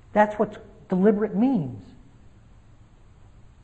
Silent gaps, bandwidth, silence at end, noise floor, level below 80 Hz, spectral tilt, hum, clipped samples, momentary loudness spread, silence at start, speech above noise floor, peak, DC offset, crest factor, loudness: none; 8 kHz; 1.8 s; -51 dBFS; -54 dBFS; -9 dB/octave; none; under 0.1%; 16 LU; 0.15 s; 29 dB; -6 dBFS; 0.1%; 20 dB; -23 LUFS